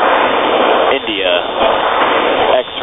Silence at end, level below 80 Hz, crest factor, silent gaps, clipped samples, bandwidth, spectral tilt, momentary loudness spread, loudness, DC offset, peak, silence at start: 0 s; -44 dBFS; 12 dB; none; under 0.1%; 3.9 kHz; -7 dB/octave; 2 LU; -12 LUFS; under 0.1%; 0 dBFS; 0 s